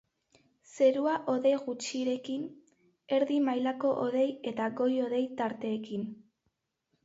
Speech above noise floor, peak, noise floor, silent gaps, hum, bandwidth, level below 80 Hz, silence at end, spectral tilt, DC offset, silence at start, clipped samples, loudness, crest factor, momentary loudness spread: 50 dB; -14 dBFS; -80 dBFS; none; none; 8 kHz; -80 dBFS; 0.9 s; -5 dB/octave; under 0.1%; 0.75 s; under 0.1%; -31 LUFS; 16 dB; 10 LU